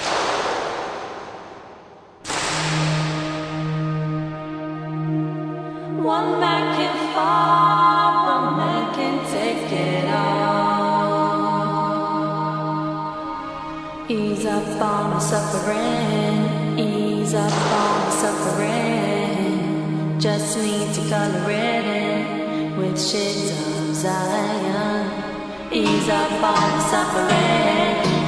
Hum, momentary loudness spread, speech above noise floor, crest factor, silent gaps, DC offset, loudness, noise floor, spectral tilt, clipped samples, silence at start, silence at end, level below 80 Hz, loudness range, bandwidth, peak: none; 10 LU; 24 dB; 16 dB; none; under 0.1%; -21 LUFS; -44 dBFS; -5 dB/octave; under 0.1%; 0 s; 0 s; -52 dBFS; 6 LU; 11 kHz; -4 dBFS